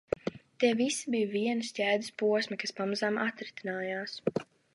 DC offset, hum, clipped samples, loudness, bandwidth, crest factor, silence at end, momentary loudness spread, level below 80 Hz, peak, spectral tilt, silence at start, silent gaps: under 0.1%; none; under 0.1%; -32 LUFS; 11.5 kHz; 20 dB; 0.3 s; 7 LU; -68 dBFS; -12 dBFS; -4 dB/octave; 0.25 s; none